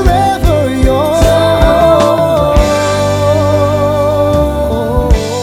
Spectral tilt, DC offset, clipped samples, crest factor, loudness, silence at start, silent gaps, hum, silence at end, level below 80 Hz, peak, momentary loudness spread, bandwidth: -6 dB/octave; under 0.1%; under 0.1%; 10 dB; -10 LUFS; 0 s; none; 50 Hz at -40 dBFS; 0 s; -18 dBFS; 0 dBFS; 4 LU; 16.5 kHz